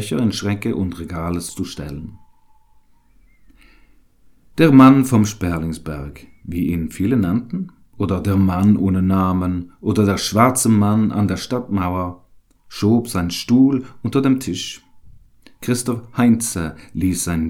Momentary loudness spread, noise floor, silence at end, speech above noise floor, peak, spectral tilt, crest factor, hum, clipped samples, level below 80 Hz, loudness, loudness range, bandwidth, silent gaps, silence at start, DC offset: 15 LU; -52 dBFS; 0 s; 35 dB; 0 dBFS; -6 dB/octave; 18 dB; none; under 0.1%; -42 dBFS; -18 LUFS; 9 LU; 16.5 kHz; none; 0 s; under 0.1%